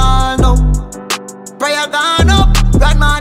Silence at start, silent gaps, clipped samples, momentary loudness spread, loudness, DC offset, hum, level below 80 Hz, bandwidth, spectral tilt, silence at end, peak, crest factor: 0 s; none; under 0.1%; 10 LU; -13 LUFS; under 0.1%; none; -12 dBFS; 16 kHz; -4.5 dB/octave; 0 s; 0 dBFS; 10 dB